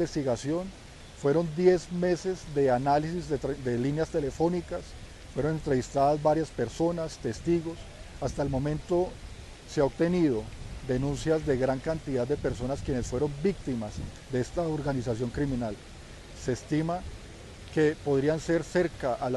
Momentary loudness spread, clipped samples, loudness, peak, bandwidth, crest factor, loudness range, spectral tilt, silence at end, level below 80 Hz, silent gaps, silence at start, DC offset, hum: 15 LU; under 0.1%; -29 LUFS; -10 dBFS; 12 kHz; 18 dB; 4 LU; -6.5 dB/octave; 0 s; -46 dBFS; none; 0 s; under 0.1%; none